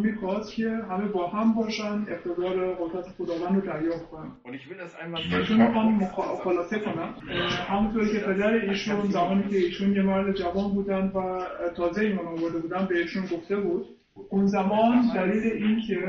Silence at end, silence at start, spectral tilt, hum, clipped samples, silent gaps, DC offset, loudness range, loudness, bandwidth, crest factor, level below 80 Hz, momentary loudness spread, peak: 0 s; 0 s; -7 dB/octave; none; under 0.1%; none; under 0.1%; 4 LU; -26 LUFS; 7 kHz; 18 dB; -54 dBFS; 10 LU; -8 dBFS